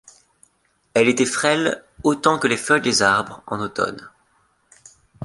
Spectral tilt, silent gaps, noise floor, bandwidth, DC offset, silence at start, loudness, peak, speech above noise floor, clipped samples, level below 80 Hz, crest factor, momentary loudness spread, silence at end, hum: -3.5 dB/octave; none; -65 dBFS; 11.5 kHz; under 0.1%; 0.95 s; -19 LUFS; -2 dBFS; 45 dB; under 0.1%; -56 dBFS; 20 dB; 10 LU; 0 s; none